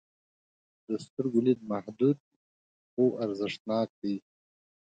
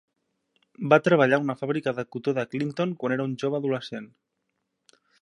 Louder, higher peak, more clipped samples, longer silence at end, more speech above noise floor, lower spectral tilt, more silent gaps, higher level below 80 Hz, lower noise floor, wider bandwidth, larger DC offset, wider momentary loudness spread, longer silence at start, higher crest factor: second, -31 LUFS vs -25 LUFS; second, -14 dBFS vs -2 dBFS; neither; second, 0.75 s vs 1.15 s; first, over 61 dB vs 54 dB; about the same, -7.5 dB/octave vs -7 dB/octave; first, 1.10-1.17 s, 2.20-2.97 s, 3.60-3.65 s, 3.90-4.02 s vs none; about the same, -76 dBFS vs -74 dBFS; first, under -90 dBFS vs -79 dBFS; second, 9 kHz vs 11 kHz; neither; about the same, 10 LU vs 11 LU; about the same, 0.9 s vs 0.8 s; second, 18 dB vs 24 dB